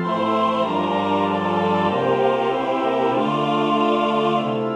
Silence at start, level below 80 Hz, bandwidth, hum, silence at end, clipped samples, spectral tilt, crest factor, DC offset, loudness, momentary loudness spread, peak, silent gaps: 0 s; -62 dBFS; 10.5 kHz; none; 0 s; under 0.1%; -7 dB/octave; 14 dB; under 0.1%; -20 LUFS; 2 LU; -6 dBFS; none